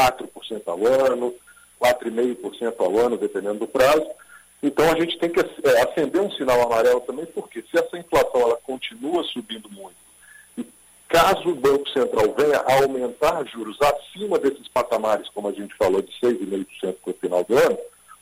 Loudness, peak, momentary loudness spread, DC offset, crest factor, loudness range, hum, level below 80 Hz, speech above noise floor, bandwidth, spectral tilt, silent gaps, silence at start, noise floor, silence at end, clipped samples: -22 LUFS; -6 dBFS; 14 LU; under 0.1%; 16 dB; 4 LU; none; -52 dBFS; 28 dB; 16 kHz; -4 dB/octave; none; 0 s; -49 dBFS; 0.35 s; under 0.1%